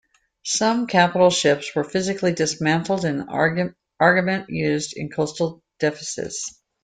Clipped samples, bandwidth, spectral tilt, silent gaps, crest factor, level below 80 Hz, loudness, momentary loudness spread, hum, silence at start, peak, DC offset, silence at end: under 0.1%; 9.6 kHz; -4 dB/octave; none; 20 dB; -60 dBFS; -21 LUFS; 11 LU; none; 0.45 s; -2 dBFS; under 0.1%; 0.35 s